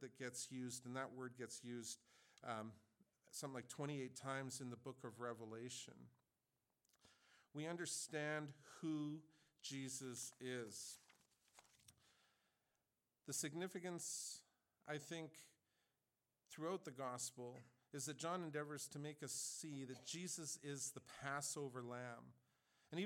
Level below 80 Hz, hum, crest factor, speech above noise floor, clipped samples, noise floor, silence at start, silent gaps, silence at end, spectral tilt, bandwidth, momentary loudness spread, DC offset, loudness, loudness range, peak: under -90 dBFS; none; 20 dB; over 40 dB; under 0.1%; under -90 dBFS; 0 s; none; 0 s; -3.5 dB/octave; 17.5 kHz; 11 LU; under 0.1%; -50 LUFS; 5 LU; -32 dBFS